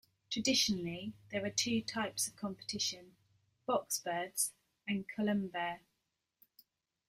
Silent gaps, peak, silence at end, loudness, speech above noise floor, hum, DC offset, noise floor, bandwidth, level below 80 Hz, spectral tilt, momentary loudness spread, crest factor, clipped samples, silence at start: none; -18 dBFS; 1.3 s; -36 LUFS; 48 dB; none; under 0.1%; -85 dBFS; 15.5 kHz; -72 dBFS; -2.5 dB/octave; 11 LU; 20 dB; under 0.1%; 0.3 s